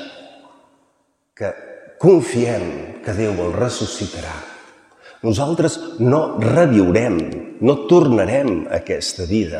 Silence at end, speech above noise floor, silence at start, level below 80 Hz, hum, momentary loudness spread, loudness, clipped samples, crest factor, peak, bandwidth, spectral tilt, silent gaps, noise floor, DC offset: 0 s; 48 dB; 0 s; -46 dBFS; none; 15 LU; -18 LUFS; under 0.1%; 18 dB; 0 dBFS; 11.5 kHz; -6.5 dB/octave; none; -65 dBFS; under 0.1%